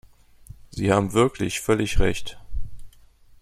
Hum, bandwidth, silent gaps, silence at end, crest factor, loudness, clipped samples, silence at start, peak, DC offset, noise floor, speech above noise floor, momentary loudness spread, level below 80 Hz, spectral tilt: none; 15 kHz; none; 0.5 s; 20 dB; -23 LUFS; under 0.1%; 0.75 s; -4 dBFS; under 0.1%; -51 dBFS; 30 dB; 18 LU; -32 dBFS; -5.5 dB/octave